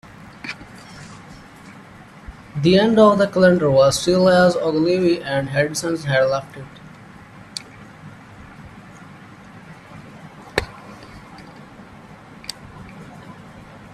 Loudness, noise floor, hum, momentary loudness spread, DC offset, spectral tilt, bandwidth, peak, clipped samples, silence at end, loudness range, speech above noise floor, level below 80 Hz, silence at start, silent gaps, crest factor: -17 LUFS; -42 dBFS; none; 27 LU; under 0.1%; -5.5 dB/octave; 13 kHz; 0 dBFS; under 0.1%; 0.35 s; 23 LU; 26 dB; -50 dBFS; 0.45 s; none; 20 dB